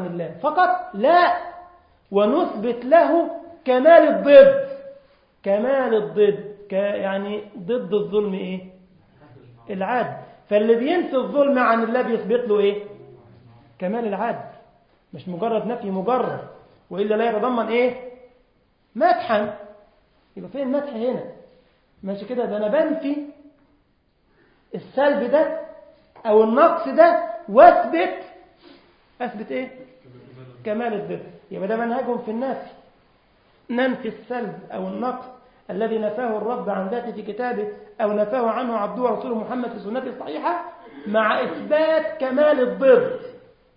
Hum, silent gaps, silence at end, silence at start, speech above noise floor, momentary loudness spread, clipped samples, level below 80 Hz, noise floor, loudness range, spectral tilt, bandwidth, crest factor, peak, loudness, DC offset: none; none; 0.4 s; 0 s; 44 dB; 17 LU; under 0.1%; -64 dBFS; -63 dBFS; 12 LU; -10 dB/octave; 5.2 kHz; 22 dB; 0 dBFS; -20 LUFS; under 0.1%